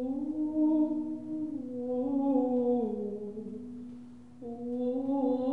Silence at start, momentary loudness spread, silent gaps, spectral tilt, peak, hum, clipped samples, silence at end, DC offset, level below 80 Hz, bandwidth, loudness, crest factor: 0 s; 16 LU; none; -10 dB/octave; -18 dBFS; none; under 0.1%; 0 s; 0.2%; -66 dBFS; 4.2 kHz; -32 LUFS; 14 dB